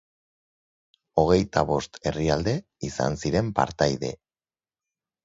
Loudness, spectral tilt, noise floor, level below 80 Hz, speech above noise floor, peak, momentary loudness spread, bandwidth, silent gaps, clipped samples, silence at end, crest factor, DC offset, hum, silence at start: -25 LUFS; -6 dB/octave; under -90 dBFS; -44 dBFS; over 66 dB; -4 dBFS; 10 LU; 8 kHz; none; under 0.1%; 1.1 s; 22 dB; under 0.1%; none; 1.15 s